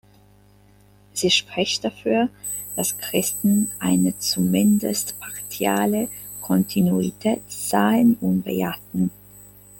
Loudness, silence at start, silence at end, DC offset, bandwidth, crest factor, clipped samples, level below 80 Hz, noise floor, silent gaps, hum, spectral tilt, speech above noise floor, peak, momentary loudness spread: -22 LUFS; 1.15 s; 0 s; under 0.1%; 17 kHz; 18 dB; under 0.1%; -56 dBFS; -53 dBFS; none; 50 Hz at -45 dBFS; -4.5 dB/octave; 32 dB; -4 dBFS; 8 LU